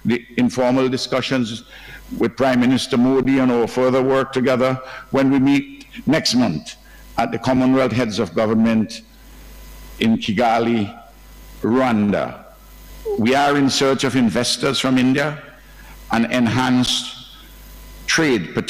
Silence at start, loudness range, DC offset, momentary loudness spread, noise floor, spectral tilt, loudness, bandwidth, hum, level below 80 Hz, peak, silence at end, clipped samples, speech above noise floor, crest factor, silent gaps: 0.05 s; 3 LU; under 0.1%; 12 LU; -41 dBFS; -5 dB/octave; -18 LUFS; 15.5 kHz; none; -46 dBFS; -4 dBFS; 0 s; under 0.1%; 24 dB; 16 dB; none